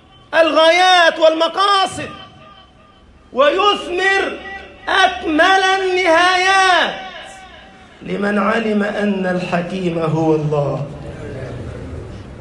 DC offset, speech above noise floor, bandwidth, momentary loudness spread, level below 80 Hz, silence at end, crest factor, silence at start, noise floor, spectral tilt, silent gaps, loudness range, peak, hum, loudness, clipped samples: under 0.1%; 31 dB; 11.5 kHz; 19 LU; -46 dBFS; 0 s; 16 dB; 0.3 s; -46 dBFS; -4.5 dB/octave; none; 6 LU; 0 dBFS; none; -14 LUFS; under 0.1%